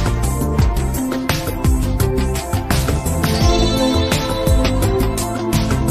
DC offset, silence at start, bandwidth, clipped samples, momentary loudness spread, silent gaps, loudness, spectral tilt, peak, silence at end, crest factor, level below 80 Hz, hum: under 0.1%; 0 s; 14.5 kHz; under 0.1%; 5 LU; none; -18 LUFS; -5.5 dB/octave; -4 dBFS; 0 s; 12 dB; -22 dBFS; none